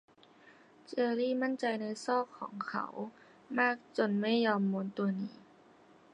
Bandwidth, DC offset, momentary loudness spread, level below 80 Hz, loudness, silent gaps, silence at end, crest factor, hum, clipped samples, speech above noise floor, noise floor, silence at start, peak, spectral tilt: 10 kHz; under 0.1%; 12 LU; -86 dBFS; -34 LUFS; none; 0.75 s; 20 dB; none; under 0.1%; 28 dB; -61 dBFS; 0.9 s; -16 dBFS; -6 dB/octave